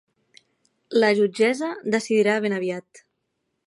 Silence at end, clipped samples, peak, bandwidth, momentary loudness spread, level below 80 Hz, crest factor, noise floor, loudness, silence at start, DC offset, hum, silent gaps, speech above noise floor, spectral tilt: 0.7 s; under 0.1%; -6 dBFS; 11.5 kHz; 8 LU; -76 dBFS; 18 dB; -76 dBFS; -22 LUFS; 0.9 s; under 0.1%; none; none; 55 dB; -5 dB/octave